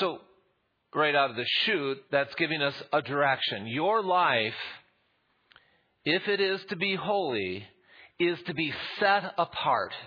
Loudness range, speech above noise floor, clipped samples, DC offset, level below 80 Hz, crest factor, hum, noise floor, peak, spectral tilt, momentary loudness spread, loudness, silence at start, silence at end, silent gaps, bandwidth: 4 LU; 45 dB; under 0.1%; under 0.1%; -74 dBFS; 20 dB; none; -73 dBFS; -10 dBFS; -6.5 dB/octave; 7 LU; -28 LUFS; 0 s; 0 s; none; 5.2 kHz